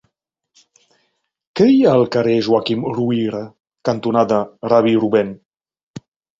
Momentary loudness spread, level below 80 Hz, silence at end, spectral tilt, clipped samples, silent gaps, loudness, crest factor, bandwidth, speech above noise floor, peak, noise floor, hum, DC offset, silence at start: 13 LU; -58 dBFS; 0.4 s; -7.5 dB/octave; under 0.1%; 5.46-5.51 s, 5.83-5.94 s; -16 LUFS; 18 dB; 7.6 kHz; 57 dB; 0 dBFS; -72 dBFS; none; under 0.1%; 1.55 s